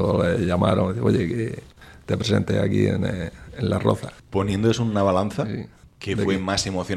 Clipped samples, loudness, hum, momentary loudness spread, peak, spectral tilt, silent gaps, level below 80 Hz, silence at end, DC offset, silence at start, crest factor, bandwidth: under 0.1%; -23 LUFS; none; 11 LU; -4 dBFS; -6.5 dB/octave; none; -46 dBFS; 0 s; under 0.1%; 0 s; 20 dB; 13 kHz